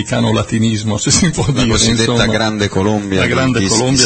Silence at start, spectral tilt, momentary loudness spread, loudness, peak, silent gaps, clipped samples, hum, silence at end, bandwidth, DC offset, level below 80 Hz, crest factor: 0 s; -4 dB/octave; 4 LU; -13 LUFS; 0 dBFS; none; under 0.1%; none; 0 s; 8.8 kHz; under 0.1%; -32 dBFS; 14 dB